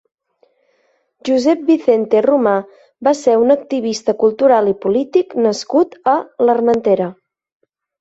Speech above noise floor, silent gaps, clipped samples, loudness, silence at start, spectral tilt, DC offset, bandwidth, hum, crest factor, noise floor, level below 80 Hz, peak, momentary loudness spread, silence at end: 47 dB; none; under 0.1%; -15 LUFS; 1.25 s; -5.5 dB/octave; under 0.1%; 8 kHz; none; 14 dB; -61 dBFS; -62 dBFS; -2 dBFS; 6 LU; 0.9 s